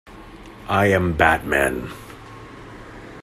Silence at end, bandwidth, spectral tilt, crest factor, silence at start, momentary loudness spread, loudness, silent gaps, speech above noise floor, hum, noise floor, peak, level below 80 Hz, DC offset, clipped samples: 0 s; 16 kHz; -5.5 dB/octave; 22 dB; 0.05 s; 23 LU; -19 LUFS; none; 22 dB; none; -40 dBFS; -2 dBFS; -42 dBFS; under 0.1%; under 0.1%